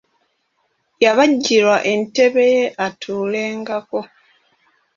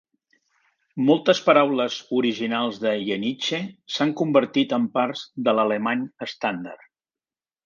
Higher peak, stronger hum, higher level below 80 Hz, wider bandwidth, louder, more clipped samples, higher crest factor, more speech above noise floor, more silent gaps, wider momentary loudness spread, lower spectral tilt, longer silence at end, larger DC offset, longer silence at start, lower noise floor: about the same, -2 dBFS vs -4 dBFS; neither; first, -64 dBFS vs -72 dBFS; about the same, 7.4 kHz vs 7.4 kHz; first, -17 LUFS vs -23 LUFS; neither; about the same, 16 dB vs 20 dB; second, 51 dB vs over 68 dB; neither; about the same, 11 LU vs 10 LU; second, -3.5 dB/octave vs -5 dB/octave; about the same, 0.9 s vs 0.9 s; neither; about the same, 1 s vs 0.95 s; second, -67 dBFS vs under -90 dBFS